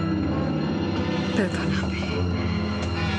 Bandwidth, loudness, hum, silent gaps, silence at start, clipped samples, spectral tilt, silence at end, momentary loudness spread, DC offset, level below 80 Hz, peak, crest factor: 10.5 kHz; -25 LUFS; none; none; 0 s; under 0.1%; -6.5 dB/octave; 0 s; 2 LU; under 0.1%; -44 dBFS; -8 dBFS; 16 dB